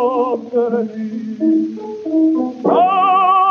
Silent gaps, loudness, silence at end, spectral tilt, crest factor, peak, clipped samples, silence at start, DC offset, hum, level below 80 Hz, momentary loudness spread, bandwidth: none; -16 LUFS; 0 s; -7.5 dB/octave; 12 dB; -2 dBFS; under 0.1%; 0 s; under 0.1%; none; -72 dBFS; 12 LU; 6.4 kHz